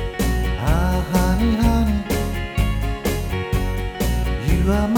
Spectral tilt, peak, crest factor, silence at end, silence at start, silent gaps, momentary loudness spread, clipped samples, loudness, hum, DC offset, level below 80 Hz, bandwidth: -6 dB/octave; -6 dBFS; 14 dB; 0 s; 0 s; none; 6 LU; under 0.1%; -21 LUFS; none; under 0.1%; -22 dBFS; 20 kHz